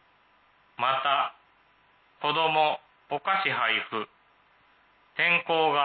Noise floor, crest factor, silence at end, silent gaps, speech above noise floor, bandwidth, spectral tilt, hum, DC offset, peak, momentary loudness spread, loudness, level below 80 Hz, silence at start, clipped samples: -63 dBFS; 18 dB; 0 s; none; 37 dB; 4.7 kHz; -7.5 dB/octave; none; under 0.1%; -10 dBFS; 13 LU; -26 LUFS; -80 dBFS; 0.8 s; under 0.1%